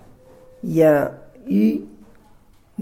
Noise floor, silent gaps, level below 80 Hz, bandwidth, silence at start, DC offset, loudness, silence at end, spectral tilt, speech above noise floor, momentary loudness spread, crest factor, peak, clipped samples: -51 dBFS; none; -56 dBFS; 16.5 kHz; 0.65 s; under 0.1%; -19 LUFS; 0 s; -8.5 dB/octave; 33 dB; 20 LU; 18 dB; -4 dBFS; under 0.1%